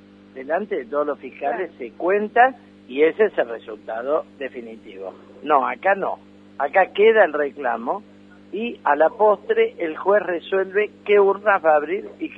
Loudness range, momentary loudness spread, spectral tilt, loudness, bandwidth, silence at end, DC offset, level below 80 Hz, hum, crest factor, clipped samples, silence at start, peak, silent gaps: 4 LU; 16 LU; -7 dB/octave; -20 LUFS; 4.2 kHz; 0.05 s; under 0.1%; -70 dBFS; 50 Hz at -50 dBFS; 18 dB; under 0.1%; 0.35 s; -2 dBFS; none